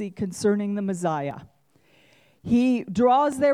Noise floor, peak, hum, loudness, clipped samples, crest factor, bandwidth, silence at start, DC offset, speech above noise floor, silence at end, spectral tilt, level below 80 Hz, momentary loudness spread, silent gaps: -61 dBFS; -10 dBFS; none; -23 LUFS; under 0.1%; 14 dB; 13.5 kHz; 0 s; under 0.1%; 38 dB; 0 s; -6.5 dB/octave; -60 dBFS; 13 LU; none